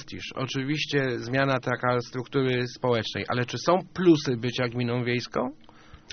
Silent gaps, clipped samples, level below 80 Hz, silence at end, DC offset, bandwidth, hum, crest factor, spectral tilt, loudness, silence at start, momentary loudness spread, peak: none; under 0.1%; -58 dBFS; 0 s; under 0.1%; 6.6 kHz; none; 20 dB; -4.5 dB/octave; -26 LUFS; 0 s; 8 LU; -8 dBFS